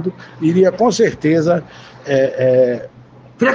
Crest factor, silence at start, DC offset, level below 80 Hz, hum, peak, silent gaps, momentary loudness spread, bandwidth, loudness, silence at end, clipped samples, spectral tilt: 14 dB; 0 s; under 0.1%; -54 dBFS; none; -2 dBFS; none; 9 LU; 7.8 kHz; -15 LUFS; 0 s; under 0.1%; -6 dB/octave